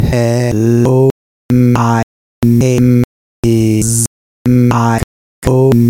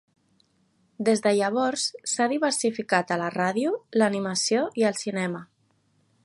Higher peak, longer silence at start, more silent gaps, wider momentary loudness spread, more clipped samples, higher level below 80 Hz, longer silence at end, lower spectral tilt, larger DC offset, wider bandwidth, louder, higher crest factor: first, 0 dBFS vs -6 dBFS; second, 0 s vs 1 s; first, 1.11-1.49 s, 2.03-2.42 s, 3.04-3.43 s, 4.07-4.45 s, 5.04-5.42 s vs none; first, 9 LU vs 5 LU; neither; first, -30 dBFS vs -74 dBFS; second, 0 s vs 0.8 s; first, -6.5 dB/octave vs -3.5 dB/octave; neither; first, 16.5 kHz vs 11.5 kHz; first, -12 LUFS vs -25 LUFS; second, 12 dB vs 20 dB